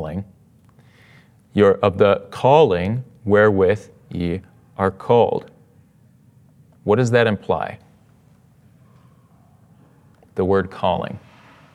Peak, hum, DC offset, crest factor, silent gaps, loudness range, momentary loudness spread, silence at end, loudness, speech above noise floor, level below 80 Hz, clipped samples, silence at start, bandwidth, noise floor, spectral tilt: 0 dBFS; none; under 0.1%; 20 dB; none; 9 LU; 16 LU; 0.55 s; -19 LUFS; 36 dB; -58 dBFS; under 0.1%; 0 s; 10.5 kHz; -53 dBFS; -7 dB/octave